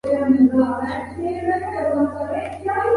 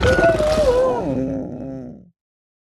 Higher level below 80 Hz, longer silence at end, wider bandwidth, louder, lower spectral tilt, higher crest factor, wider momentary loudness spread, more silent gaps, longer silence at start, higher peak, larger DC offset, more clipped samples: second, -46 dBFS vs -34 dBFS; second, 0 s vs 0.8 s; second, 11 kHz vs 13 kHz; about the same, -20 LUFS vs -18 LUFS; first, -8 dB/octave vs -6 dB/octave; about the same, 16 dB vs 16 dB; second, 11 LU vs 17 LU; neither; about the same, 0.05 s vs 0 s; about the same, -4 dBFS vs -4 dBFS; neither; neither